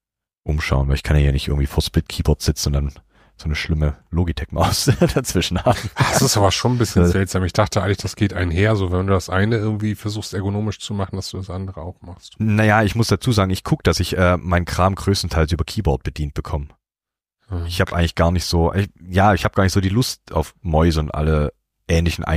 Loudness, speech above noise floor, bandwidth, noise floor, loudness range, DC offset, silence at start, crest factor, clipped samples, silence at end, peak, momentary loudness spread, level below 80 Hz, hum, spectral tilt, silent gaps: -19 LUFS; 71 dB; 15.5 kHz; -90 dBFS; 5 LU; under 0.1%; 0.45 s; 18 dB; under 0.1%; 0 s; -2 dBFS; 10 LU; -28 dBFS; none; -5.5 dB/octave; none